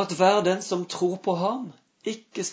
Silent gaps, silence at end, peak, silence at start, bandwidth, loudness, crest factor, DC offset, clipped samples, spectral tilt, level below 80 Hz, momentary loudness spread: none; 0 s; -6 dBFS; 0 s; 8 kHz; -25 LUFS; 20 dB; under 0.1%; under 0.1%; -4.5 dB/octave; -76 dBFS; 14 LU